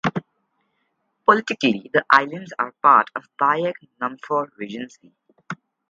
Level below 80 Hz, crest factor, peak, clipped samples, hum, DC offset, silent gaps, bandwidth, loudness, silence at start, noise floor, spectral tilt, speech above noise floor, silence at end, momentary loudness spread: -70 dBFS; 22 dB; 0 dBFS; under 0.1%; none; under 0.1%; none; 7.8 kHz; -20 LUFS; 0.05 s; -72 dBFS; -5.5 dB/octave; 51 dB; 0.35 s; 18 LU